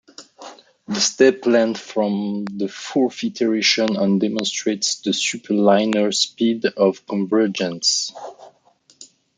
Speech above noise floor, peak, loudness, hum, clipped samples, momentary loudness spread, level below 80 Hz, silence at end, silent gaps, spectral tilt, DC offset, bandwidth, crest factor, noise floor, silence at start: 38 dB; -2 dBFS; -19 LUFS; none; under 0.1%; 10 LU; -70 dBFS; 0.35 s; none; -3.5 dB/octave; under 0.1%; 9.6 kHz; 18 dB; -57 dBFS; 0.2 s